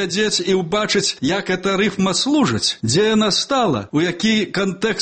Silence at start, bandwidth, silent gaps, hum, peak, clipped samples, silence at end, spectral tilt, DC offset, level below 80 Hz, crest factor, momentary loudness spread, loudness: 0 s; 8.8 kHz; none; none; -6 dBFS; under 0.1%; 0 s; -4 dB/octave; under 0.1%; -52 dBFS; 12 dB; 4 LU; -18 LUFS